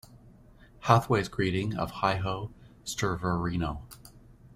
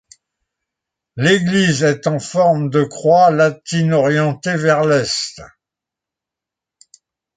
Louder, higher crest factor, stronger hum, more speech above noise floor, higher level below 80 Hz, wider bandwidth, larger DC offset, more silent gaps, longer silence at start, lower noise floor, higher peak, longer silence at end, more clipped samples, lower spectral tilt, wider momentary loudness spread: second, -29 LUFS vs -15 LUFS; first, 26 dB vs 16 dB; neither; second, 26 dB vs 70 dB; first, -50 dBFS vs -56 dBFS; first, 16 kHz vs 9.4 kHz; neither; neither; second, 0.1 s vs 1.15 s; second, -55 dBFS vs -85 dBFS; about the same, -4 dBFS vs -2 dBFS; second, 0 s vs 1.9 s; neither; about the same, -5.5 dB/octave vs -5.5 dB/octave; first, 18 LU vs 8 LU